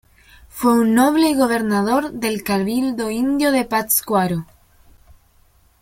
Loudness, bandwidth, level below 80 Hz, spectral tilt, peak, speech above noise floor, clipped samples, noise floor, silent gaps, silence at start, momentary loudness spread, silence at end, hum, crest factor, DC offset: -18 LUFS; 16.5 kHz; -50 dBFS; -4.5 dB/octave; -4 dBFS; 37 dB; under 0.1%; -55 dBFS; none; 0.55 s; 8 LU; 1.4 s; none; 16 dB; under 0.1%